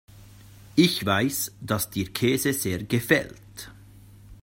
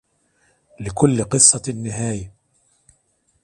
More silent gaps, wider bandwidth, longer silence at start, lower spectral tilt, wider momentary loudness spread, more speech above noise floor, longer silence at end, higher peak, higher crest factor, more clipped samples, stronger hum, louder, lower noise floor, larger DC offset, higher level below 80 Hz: neither; first, 16.5 kHz vs 11.5 kHz; second, 0.15 s vs 0.8 s; about the same, -4.5 dB/octave vs -4 dB/octave; about the same, 20 LU vs 19 LU; second, 24 dB vs 46 dB; second, 0.1 s vs 1.15 s; second, -4 dBFS vs 0 dBFS; about the same, 22 dB vs 22 dB; neither; neither; second, -24 LUFS vs -16 LUFS; second, -49 dBFS vs -65 dBFS; neither; second, -54 dBFS vs -48 dBFS